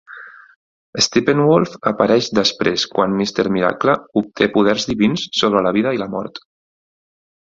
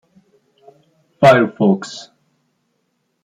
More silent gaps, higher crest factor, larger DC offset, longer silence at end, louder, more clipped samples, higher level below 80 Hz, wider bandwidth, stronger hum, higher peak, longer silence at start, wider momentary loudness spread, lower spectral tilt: first, 0.56-0.93 s vs none; about the same, 16 dB vs 18 dB; neither; about the same, 1.15 s vs 1.2 s; second, -17 LUFS vs -14 LUFS; neither; about the same, -54 dBFS vs -58 dBFS; second, 7.8 kHz vs 13 kHz; neither; about the same, -2 dBFS vs 0 dBFS; second, 0.1 s vs 1.2 s; second, 11 LU vs 20 LU; second, -4.5 dB/octave vs -6.5 dB/octave